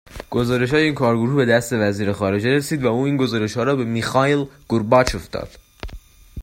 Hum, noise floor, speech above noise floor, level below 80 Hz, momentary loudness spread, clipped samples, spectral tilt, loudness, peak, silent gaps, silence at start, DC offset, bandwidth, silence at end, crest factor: none; -40 dBFS; 21 dB; -42 dBFS; 14 LU; under 0.1%; -6 dB/octave; -19 LUFS; 0 dBFS; none; 0.1 s; under 0.1%; 16 kHz; 0 s; 20 dB